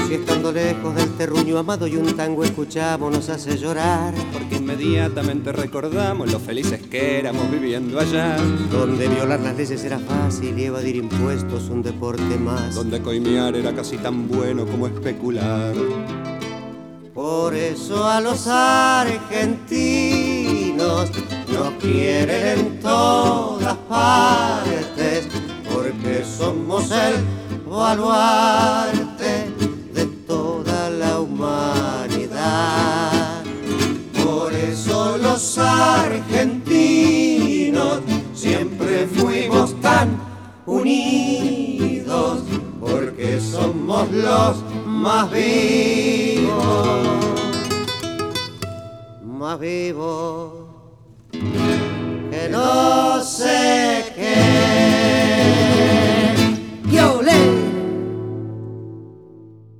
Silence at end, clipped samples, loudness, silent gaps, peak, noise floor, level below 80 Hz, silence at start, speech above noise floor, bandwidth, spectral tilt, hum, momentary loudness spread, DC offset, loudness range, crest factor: 0.05 s; under 0.1%; -19 LUFS; none; -2 dBFS; -45 dBFS; -50 dBFS; 0 s; 26 dB; 17.5 kHz; -5 dB/octave; none; 11 LU; under 0.1%; 7 LU; 18 dB